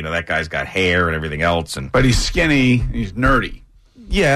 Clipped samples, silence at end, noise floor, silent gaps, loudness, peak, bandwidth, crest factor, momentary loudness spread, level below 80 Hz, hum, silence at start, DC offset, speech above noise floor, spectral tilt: under 0.1%; 0 s; -39 dBFS; none; -17 LUFS; -6 dBFS; 13.5 kHz; 12 dB; 7 LU; -28 dBFS; none; 0 s; under 0.1%; 22 dB; -5 dB/octave